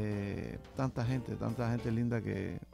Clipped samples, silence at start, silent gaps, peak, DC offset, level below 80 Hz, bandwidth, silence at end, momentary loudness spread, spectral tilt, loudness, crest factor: under 0.1%; 0 s; none; -22 dBFS; under 0.1%; -54 dBFS; 12 kHz; 0 s; 5 LU; -8 dB/octave; -36 LUFS; 14 dB